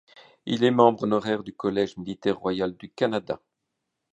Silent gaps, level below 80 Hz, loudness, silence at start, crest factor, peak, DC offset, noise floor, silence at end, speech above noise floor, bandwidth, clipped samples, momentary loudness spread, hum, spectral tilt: none; -62 dBFS; -25 LUFS; 0.45 s; 22 dB; -4 dBFS; under 0.1%; -81 dBFS; 0.8 s; 57 dB; 8.4 kHz; under 0.1%; 12 LU; none; -6.5 dB/octave